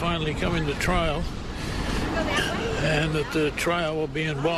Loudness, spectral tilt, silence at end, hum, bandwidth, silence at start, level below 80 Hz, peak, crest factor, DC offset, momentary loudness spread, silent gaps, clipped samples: -26 LUFS; -5 dB/octave; 0 s; none; 13.5 kHz; 0 s; -34 dBFS; -10 dBFS; 14 dB; under 0.1%; 6 LU; none; under 0.1%